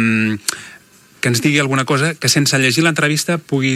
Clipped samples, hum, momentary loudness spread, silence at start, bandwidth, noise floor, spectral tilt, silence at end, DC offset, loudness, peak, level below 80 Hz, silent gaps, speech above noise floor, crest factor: under 0.1%; none; 8 LU; 0 s; 16 kHz; -45 dBFS; -4 dB/octave; 0 s; under 0.1%; -15 LUFS; 0 dBFS; -60 dBFS; none; 30 dB; 16 dB